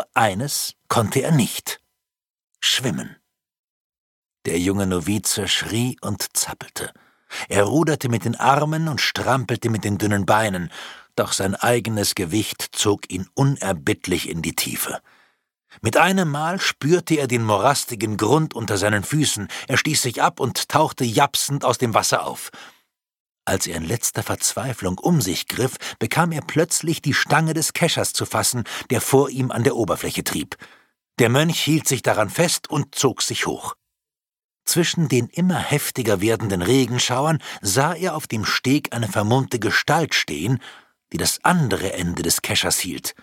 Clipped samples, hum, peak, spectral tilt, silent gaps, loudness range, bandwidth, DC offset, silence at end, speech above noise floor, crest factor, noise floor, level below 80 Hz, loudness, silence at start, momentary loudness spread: under 0.1%; none; 0 dBFS; -4 dB/octave; 2.30-2.35 s, 2.43-2.48 s, 3.59-3.90 s, 3.98-4.23 s, 23.20-23.35 s, 34.44-34.49 s; 3 LU; 17.5 kHz; under 0.1%; 0.1 s; 68 dB; 20 dB; -89 dBFS; -54 dBFS; -20 LUFS; 0 s; 8 LU